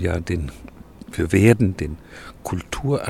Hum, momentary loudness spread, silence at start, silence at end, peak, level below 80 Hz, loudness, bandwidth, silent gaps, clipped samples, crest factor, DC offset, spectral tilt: none; 20 LU; 0 s; 0 s; -2 dBFS; -38 dBFS; -21 LUFS; 14.5 kHz; none; under 0.1%; 20 dB; under 0.1%; -7 dB/octave